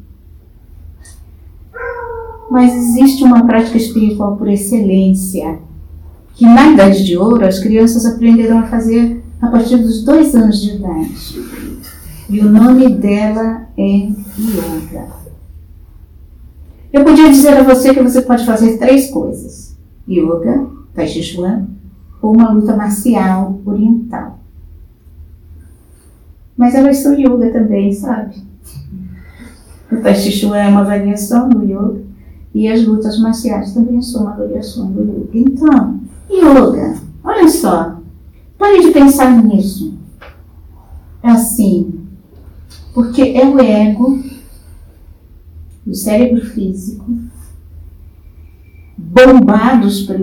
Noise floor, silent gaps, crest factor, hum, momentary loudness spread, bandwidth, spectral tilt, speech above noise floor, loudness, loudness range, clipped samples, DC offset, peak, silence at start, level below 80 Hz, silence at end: -41 dBFS; none; 12 dB; none; 18 LU; 19 kHz; -6 dB/octave; 32 dB; -10 LUFS; 8 LU; 1%; under 0.1%; 0 dBFS; 0.9 s; -34 dBFS; 0 s